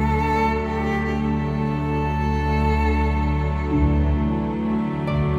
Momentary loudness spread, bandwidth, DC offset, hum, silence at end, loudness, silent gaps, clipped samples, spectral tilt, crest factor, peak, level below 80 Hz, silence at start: 3 LU; 7.4 kHz; under 0.1%; none; 0 s; -22 LUFS; none; under 0.1%; -8.5 dB/octave; 12 dB; -8 dBFS; -26 dBFS; 0 s